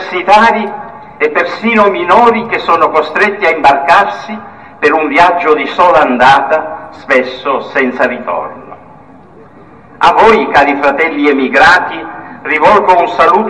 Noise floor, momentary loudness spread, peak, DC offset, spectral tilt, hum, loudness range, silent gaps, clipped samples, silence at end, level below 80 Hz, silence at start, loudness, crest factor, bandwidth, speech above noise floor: -37 dBFS; 13 LU; 0 dBFS; 0.5%; -4.5 dB/octave; none; 4 LU; none; 0.9%; 0 s; -44 dBFS; 0 s; -9 LUFS; 10 dB; 11 kHz; 28 dB